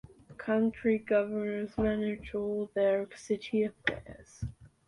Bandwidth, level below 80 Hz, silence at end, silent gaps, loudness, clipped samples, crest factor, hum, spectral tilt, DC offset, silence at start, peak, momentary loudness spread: 11 kHz; -54 dBFS; 0.2 s; none; -31 LUFS; under 0.1%; 20 dB; none; -6.5 dB/octave; under 0.1%; 0.3 s; -12 dBFS; 14 LU